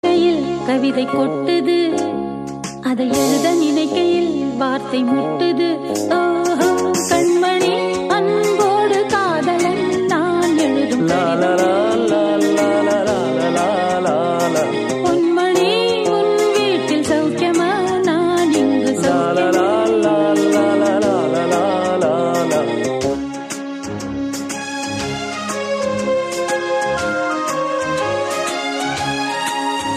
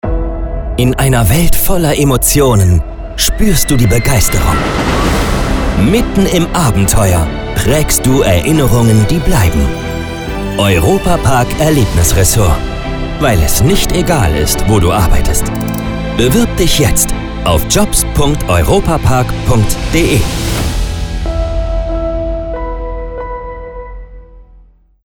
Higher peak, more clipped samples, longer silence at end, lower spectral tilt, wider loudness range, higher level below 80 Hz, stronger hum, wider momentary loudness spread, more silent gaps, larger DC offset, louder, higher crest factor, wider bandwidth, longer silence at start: second, -4 dBFS vs 0 dBFS; neither; second, 0 s vs 0.65 s; about the same, -4.5 dB/octave vs -5 dB/octave; about the same, 5 LU vs 5 LU; second, -52 dBFS vs -18 dBFS; neither; second, 7 LU vs 10 LU; neither; neither; second, -17 LUFS vs -12 LUFS; about the same, 14 dB vs 10 dB; second, 15 kHz vs over 20 kHz; about the same, 0.05 s vs 0.05 s